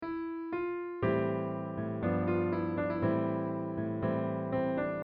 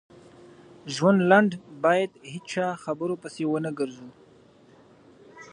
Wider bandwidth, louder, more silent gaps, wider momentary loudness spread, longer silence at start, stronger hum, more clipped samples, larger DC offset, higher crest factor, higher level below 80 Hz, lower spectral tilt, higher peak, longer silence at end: second, 5 kHz vs 10 kHz; second, -33 LUFS vs -25 LUFS; neither; second, 6 LU vs 15 LU; second, 0 s vs 0.85 s; neither; neither; neither; second, 16 dB vs 24 dB; first, -60 dBFS vs -72 dBFS; first, -8 dB/octave vs -6 dB/octave; second, -18 dBFS vs -4 dBFS; about the same, 0 s vs 0.1 s